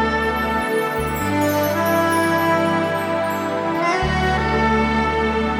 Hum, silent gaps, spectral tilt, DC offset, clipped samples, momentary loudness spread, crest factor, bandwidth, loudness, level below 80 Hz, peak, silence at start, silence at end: none; none; -5.5 dB/octave; under 0.1%; under 0.1%; 4 LU; 14 dB; 17 kHz; -19 LUFS; -34 dBFS; -6 dBFS; 0 s; 0 s